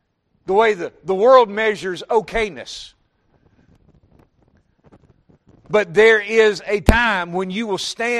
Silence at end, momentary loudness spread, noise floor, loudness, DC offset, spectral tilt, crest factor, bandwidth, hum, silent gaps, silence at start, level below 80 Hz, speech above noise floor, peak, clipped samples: 0 s; 13 LU; -61 dBFS; -17 LUFS; under 0.1%; -4.5 dB/octave; 20 dB; 13 kHz; none; none; 0.5 s; -36 dBFS; 44 dB; 0 dBFS; under 0.1%